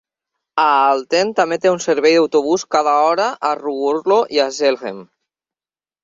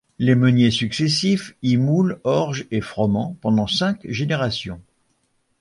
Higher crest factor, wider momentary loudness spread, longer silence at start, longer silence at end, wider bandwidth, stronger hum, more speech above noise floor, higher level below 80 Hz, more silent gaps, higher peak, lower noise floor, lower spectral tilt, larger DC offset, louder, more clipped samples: about the same, 16 dB vs 16 dB; about the same, 7 LU vs 9 LU; first, 0.55 s vs 0.2 s; first, 1 s vs 0.8 s; second, 7.8 kHz vs 11.5 kHz; neither; first, over 74 dB vs 48 dB; second, -66 dBFS vs -50 dBFS; neither; about the same, -2 dBFS vs -4 dBFS; first, under -90 dBFS vs -67 dBFS; second, -3.5 dB/octave vs -6 dB/octave; neither; first, -16 LUFS vs -20 LUFS; neither